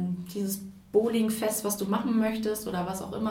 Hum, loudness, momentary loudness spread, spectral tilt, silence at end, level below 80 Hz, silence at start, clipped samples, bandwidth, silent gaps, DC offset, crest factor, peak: none; -29 LUFS; 7 LU; -5 dB/octave; 0 s; -58 dBFS; 0 s; under 0.1%; 17.5 kHz; none; under 0.1%; 18 dB; -12 dBFS